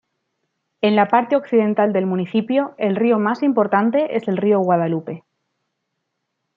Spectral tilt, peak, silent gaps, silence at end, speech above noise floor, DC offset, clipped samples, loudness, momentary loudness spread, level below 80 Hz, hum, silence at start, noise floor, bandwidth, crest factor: -9 dB/octave; -2 dBFS; none; 1.4 s; 58 dB; under 0.1%; under 0.1%; -18 LUFS; 5 LU; -70 dBFS; none; 0.85 s; -76 dBFS; 5.4 kHz; 18 dB